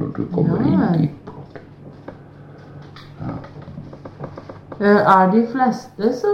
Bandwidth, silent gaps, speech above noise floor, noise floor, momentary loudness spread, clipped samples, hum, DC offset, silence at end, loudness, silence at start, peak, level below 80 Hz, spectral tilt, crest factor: 7.2 kHz; none; 24 dB; -40 dBFS; 26 LU; under 0.1%; none; under 0.1%; 0 s; -17 LUFS; 0 s; 0 dBFS; -50 dBFS; -8.5 dB/octave; 20 dB